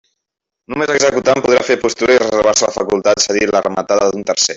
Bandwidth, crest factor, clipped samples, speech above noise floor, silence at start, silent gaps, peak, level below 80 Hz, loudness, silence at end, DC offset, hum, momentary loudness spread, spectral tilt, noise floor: 8 kHz; 14 dB; under 0.1%; 66 dB; 0.7 s; none; 0 dBFS; -48 dBFS; -14 LUFS; 0 s; under 0.1%; none; 4 LU; -2.5 dB/octave; -80 dBFS